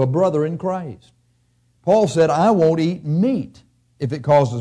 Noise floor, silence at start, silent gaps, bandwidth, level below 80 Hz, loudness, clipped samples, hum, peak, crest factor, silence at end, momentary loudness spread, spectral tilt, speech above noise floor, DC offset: -61 dBFS; 0 s; none; 11 kHz; -58 dBFS; -18 LUFS; under 0.1%; 60 Hz at -45 dBFS; -6 dBFS; 12 dB; 0 s; 13 LU; -7.5 dB/octave; 44 dB; under 0.1%